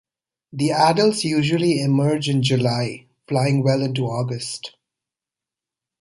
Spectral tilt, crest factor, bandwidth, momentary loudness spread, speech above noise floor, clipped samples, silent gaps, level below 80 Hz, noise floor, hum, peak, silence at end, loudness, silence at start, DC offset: -6 dB/octave; 18 dB; 11.5 kHz; 12 LU; 69 dB; under 0.1%; none; -60 dBFS; -88 dBFS; none; -4 dBFS; 1.3 s; -20 LUFS; 0.55 s; under 0.1%